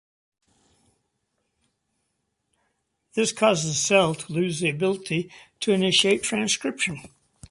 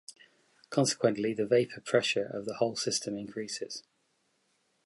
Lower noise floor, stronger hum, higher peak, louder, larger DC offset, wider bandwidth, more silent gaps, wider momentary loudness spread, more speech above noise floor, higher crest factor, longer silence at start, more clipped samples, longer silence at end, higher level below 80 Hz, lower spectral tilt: about the same, -76 dBFS vs -75 dBFS; neither; first, -6 dBFS vs -10 dBFS; first, -23 LUFS vs -31 LUFS; neither; about the same, 11.5 kHz vs 11.5 kHz; neither; about the same, 10 LU vs 10 LU; first, 53 dB vs 44 dB; about the same, 20 dB vs 22 dB; first, 3.15 s vs 0.1 s; neither; second, 0.45 s vs 1.05 s; first, -64 dBFS vs -74 dBFS; about the same, -3.5 dB/octave vs -4 dB/octave